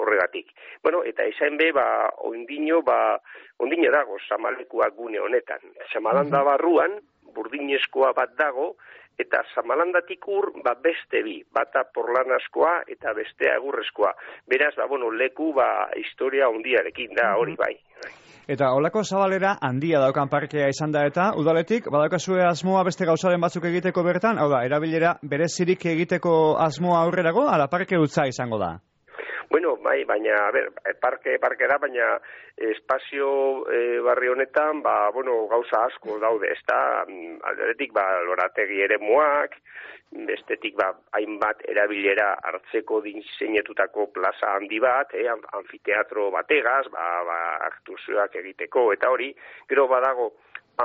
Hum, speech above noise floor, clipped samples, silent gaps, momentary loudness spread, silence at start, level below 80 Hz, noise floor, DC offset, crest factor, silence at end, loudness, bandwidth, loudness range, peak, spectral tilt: none; 20 dB; under 0.1%; none; 10 LU; 0 s; -68 dBFS; -43 dBFS; under 0.1%; 16 dB; 0 s; -23 LUFS; 7.6 kHz; 3 LU; -8 dBFS; -4 dB/octave